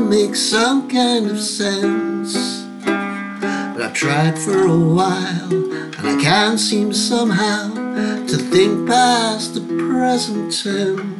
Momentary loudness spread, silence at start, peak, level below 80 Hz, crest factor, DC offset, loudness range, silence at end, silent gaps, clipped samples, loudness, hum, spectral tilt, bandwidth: 8 LU; 0 s; -2 dBFS; -60 dBFS; 16 dB; under 0.1%; 3 LU; 0 s; none; under 0.1%; -17 LUFS; none; -4.5 dB/octave; 12.5 kHz